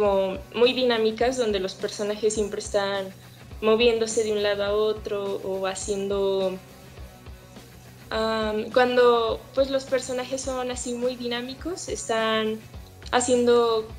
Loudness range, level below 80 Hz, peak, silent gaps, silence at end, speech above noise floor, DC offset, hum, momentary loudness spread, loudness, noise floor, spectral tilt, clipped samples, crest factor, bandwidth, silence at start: 4 LU; -48 dBFS; -6 dBFS; none; 0 s; 22 dB; under 0.1%; none; 12 LU; -24 LUFS; -46 dBFS; -3.5 dB/octave; under 0.1%; 18 dB; 15.5 kHz; 0 s